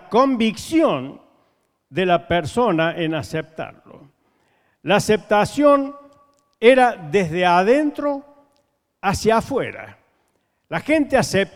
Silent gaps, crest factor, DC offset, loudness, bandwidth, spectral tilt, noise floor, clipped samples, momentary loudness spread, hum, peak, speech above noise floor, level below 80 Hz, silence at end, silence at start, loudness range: none; 20 dB; under 0.1%; -19 LUFS; 16 kHz; -5 dB/octave; -68 dBFS; under 0.1%; 14 LU; none; 0 dBFS; 49 dB; -50 dBFS; 0.05 s; 0.1 s; 5 LU